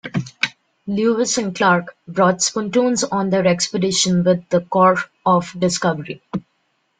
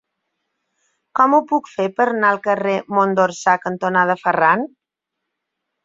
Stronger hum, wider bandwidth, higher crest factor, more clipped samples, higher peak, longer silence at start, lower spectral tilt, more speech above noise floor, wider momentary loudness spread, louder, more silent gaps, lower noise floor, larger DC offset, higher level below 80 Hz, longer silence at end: neither; first, 9.6 kHz vs 7.8 kHz; about the same, 18 dB vs 18 dB; neither; about the same, -2 dBFS vs -2 dBFS; second, 0.05 s vs 1.15 s; second, -4 dB/octave vs -5.5 dB/octave; second, 49 dB vs 64 dB; first, 11 LU vs 6 LU; about the same, -18 LUFS vs -17 LUFS; neither; second, -67 dBFS vs -81 dBFS; neither; first, -56 dBFS vs -66 dBFS; second, 0.6 s vs 1.2 s